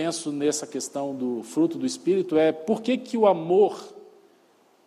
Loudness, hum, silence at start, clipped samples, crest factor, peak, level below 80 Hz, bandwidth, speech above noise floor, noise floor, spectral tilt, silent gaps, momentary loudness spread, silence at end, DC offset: -24 LUFS; none; 0 s; under 0.1%; 18 dB; -6 dBFS; -74 dBFS; 14 kHz; 36 dB; -60 dBFS; -5 dB/octave; none; 9 LU; 0.85 s; under 0.1%